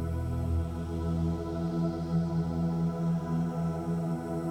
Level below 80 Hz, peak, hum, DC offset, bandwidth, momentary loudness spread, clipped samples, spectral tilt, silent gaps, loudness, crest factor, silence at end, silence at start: -42 dBFS; -18 dBFS; none; under 0.1%; 9.6 kHz; 3 LU; under 0.1%; -9 dB/octave; none; -32 LUFS; 12 dB; 0 s; 0 s